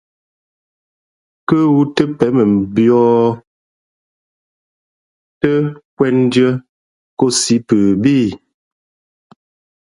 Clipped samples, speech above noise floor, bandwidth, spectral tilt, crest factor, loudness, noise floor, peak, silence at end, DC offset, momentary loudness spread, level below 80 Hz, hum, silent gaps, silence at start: under 0.1%; over 78 dB; 11.5 kHz; -5.5 dB/octave; 16 dB; -14 LUFS; under -90 dBFS; 0 dBFS; 1.45 s; under 0.1%; 9 LU; -52 dBFS; none; 3.47-5.41 s, 5.85-5.97 s, 6.69-7.17 s; 1.5 s